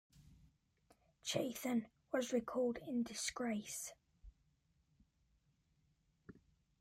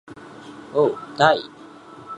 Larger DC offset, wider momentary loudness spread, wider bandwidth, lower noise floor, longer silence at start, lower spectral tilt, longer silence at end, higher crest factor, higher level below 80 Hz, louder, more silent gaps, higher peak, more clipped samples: neither; second, 8 LU vs 24 LU; first, 16 kHz vs 10.5 kHz; first, -79 dBFS vs -43 dBFS; about the same, 0.15 s vs 0.1 s; second, -3.5 dB/octave vs -5 dB/octave; first, 0.4 s vs 0 s; about the same, 22 dB vs 22 dB; about the same, -72 dBFS vs -68 dBFS; second, -42 LUFS vs -20 LUFS; neither; second, -24 dBFS vs -2 dBFS; neither